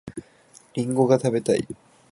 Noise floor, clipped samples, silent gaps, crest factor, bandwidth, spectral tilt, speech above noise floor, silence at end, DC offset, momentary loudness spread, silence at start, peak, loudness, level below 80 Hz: -54 dBFS; under 0.1%; none; 18 dB; 11.5 kHz; -6.5 dB/octave; 32 dB; 0.4 s; under 0.1%; 21 LU; 0.05 s; -6 dBFS; -23 LUFS; -60 dBFS